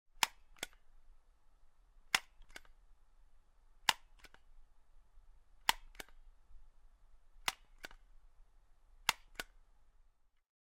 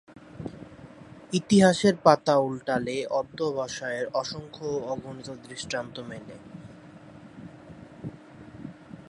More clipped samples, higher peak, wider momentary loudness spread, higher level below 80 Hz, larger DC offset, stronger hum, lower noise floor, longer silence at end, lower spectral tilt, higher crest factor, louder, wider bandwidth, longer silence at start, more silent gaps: neither; second, -8 dBFS vs -2 dBFS; second, 19 LU vs 27 LU; about the same, -62 dBFS vs -60 dBFS; neither; neither; first, -69 dBFS vs -48 dBFS; first, 0.75 s vs 0.1 s; second, 0.5 dB/octave vs -5.5 dB/octave; first, 38 dB vs 26 dB; second, -39 LUFS vs -26 LUFS; first, 16 kHz vs 11.5 kHz; about the same, 0.15 s vs 0.15 s; neither